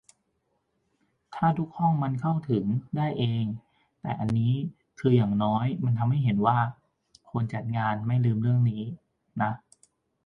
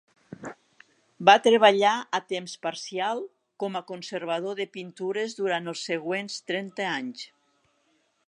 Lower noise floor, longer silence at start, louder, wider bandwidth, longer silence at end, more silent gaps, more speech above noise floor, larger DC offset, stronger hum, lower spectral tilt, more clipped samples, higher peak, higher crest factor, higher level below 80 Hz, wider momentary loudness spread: first, -75 dBFS vs -69 dBFS; first, 1.3 s vs 0.3 s; about the same, -27 LUFS vs -26 LUFS; second, 6.2 kHz vs 11 kHz; second, 0.7 s vs 1 s; neither; first, 50 dB vs 44 dB; neither; neither; first, -9 dB/octave vs -3.5 dB/octave; neither; second, -10 dBFS vs -2 dBFS; second, 18 dB vs 26 dB; first, -60 dBFS vs -80 dBFS; second, 12 LU vs 20 LU